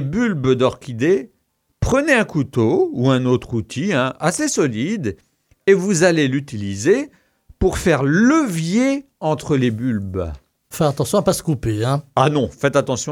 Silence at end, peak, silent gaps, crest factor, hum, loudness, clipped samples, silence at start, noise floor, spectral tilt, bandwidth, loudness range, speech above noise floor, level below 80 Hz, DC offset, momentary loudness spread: 0 s; 0 dBFS; none; 18 dB; none; -18 LUFS; under 0.1%; 0 s; -67 dBFS; -5.5 dB/octave; 17 kHz; 2 LU; 49 dB; -40 dBFS; under 0.1%; 8 LU